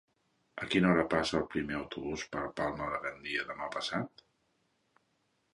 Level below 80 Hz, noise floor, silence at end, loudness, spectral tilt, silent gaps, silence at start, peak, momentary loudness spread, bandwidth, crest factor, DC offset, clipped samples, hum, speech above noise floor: -60 dBFS; -77 dBFS; 1.45 s; -34 LUFS; -5.5 dB/octave; none; 0.55 s; -12 dBFS; 11 LU; 11.5 kHz; 24 dB; under 0.1%; under 0.1%; none; 43 dB